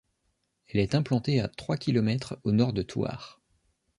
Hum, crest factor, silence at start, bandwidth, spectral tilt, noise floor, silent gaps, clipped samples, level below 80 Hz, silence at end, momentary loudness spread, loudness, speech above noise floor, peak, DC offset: none; 18 dB; 0.75 s; 11.5 kHz; -7.5 dB/octave; -76 dBFS; none; under 0.1%; -54 dBFS; 0.65 s; 7 LU; -28 LUFS; 49 dB; -10 dBFS; under 0.1%